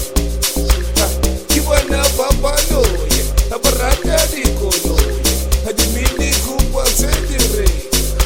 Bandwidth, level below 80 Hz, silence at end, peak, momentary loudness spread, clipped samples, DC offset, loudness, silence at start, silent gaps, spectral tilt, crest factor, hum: 17 kHz; -18 dBFS; 0 s; 0 dBFS; 3 LU; under 0.1%; under 0.1%; -15 LUFS; 0 s; none; -3.5 dB/octave; 14 dB; none